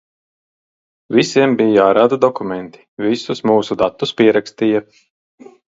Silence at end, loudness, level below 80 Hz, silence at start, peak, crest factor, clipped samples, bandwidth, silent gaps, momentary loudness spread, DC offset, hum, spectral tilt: 0.9 s; -15 LUFS; -58 dBFS; 1.1 s; 0 dBFS; 16 dB; under 0.1%; 7.8 kHz; 2.88-2.97 s; 11 LU; under 0.1%; none; -5.5 dB/octave